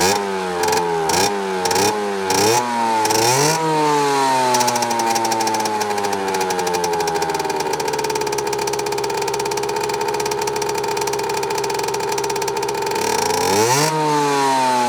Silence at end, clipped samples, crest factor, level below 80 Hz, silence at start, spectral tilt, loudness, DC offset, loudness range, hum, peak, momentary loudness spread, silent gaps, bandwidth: 0 s; under 0.1%; 14 dB; -54 dBFS; 0 s; -2.5 dB/octave; -18 LUFS; under 0.1%; 4 LU; none; -4 dBFS; 5 LU; none; over 20 kHz